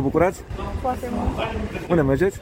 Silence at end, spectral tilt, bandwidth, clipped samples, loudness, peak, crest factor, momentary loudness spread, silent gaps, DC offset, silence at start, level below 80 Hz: 0 s; -7 dB/octave; 16.5 kHz; under 0.1%; -23 LUFS; -6 dBFS; 16 dB; 9 LU; none; under 0.1%; 0 s; -34 dBFS